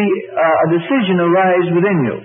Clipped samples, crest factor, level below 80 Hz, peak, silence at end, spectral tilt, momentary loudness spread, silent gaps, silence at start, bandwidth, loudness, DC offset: under 0.1%; 10 dB; -60 dBFS; -4 dBFS; 0 s; -12.5 dB/octave; 3 LU; none; 0 s; 3.8 kHz; -14 LUFS; under 0.1%